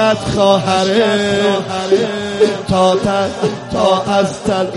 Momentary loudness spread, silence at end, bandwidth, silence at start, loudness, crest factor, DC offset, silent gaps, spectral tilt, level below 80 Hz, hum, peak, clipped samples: 5 LU; 0 s; 11.5 kHz; 0 s; -14 LUFS; 14 dB; under 0.1%; none; -5 dB/octave; -42 dBFS; none; 0 dBFS; under 0.1%